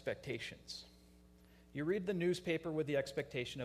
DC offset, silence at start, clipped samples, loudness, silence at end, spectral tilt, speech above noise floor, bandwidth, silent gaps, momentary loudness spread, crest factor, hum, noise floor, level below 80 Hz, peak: under 0.1%; 0 s; under 0.1%; -40 LUFS; 0 s; -5.5 dB/octave; 24 dB; 15 kHz; none; 13 LU; 16 dB; none; -64 dBFS; -68 dBFS; -24 dBFS